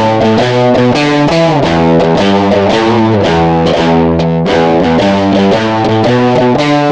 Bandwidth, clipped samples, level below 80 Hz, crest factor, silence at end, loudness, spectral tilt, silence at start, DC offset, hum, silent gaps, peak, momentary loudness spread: 9.2 kHz; under 0.1%; -34 dBFS; 8 dB; 0 s; -9 LUFS; -6.5 dB/octave; 0 s; under 0.1%; none; none; 0 dBFS; 1 LU